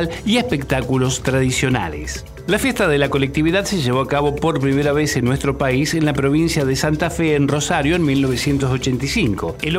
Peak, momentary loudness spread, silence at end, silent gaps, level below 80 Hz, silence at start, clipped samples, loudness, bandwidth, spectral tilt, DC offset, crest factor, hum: -4 dBFS; 3 LU; 0 s; none; -34 dBFS; 0 s; under 0.1%; -18 LUFS; 16 kHz; -5 dB/octave; under 0.1%; 14 dB; none